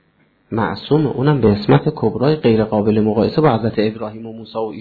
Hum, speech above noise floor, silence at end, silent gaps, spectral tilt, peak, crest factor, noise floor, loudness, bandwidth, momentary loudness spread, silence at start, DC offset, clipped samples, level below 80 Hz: none; 42 dB; 0 s; none; -10.5 dB/octave; -2 dBFS; 16 dB; -58 dBFS; -16 LUFS; 4.8 kHz; 11 LU; 0.5 s; under 0.1%; under 0.1%; -46 dBFS